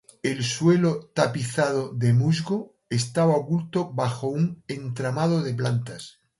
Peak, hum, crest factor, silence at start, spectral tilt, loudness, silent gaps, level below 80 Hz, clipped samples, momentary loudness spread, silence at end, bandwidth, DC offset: -4 dBFS; none; 20 dB; 0.25 s; -6 dB/octave; -25 LUFS; none; -62 dBFS; under 0.1%; 9 LU; 0.3 s; 11.5 kHz; under 0.1%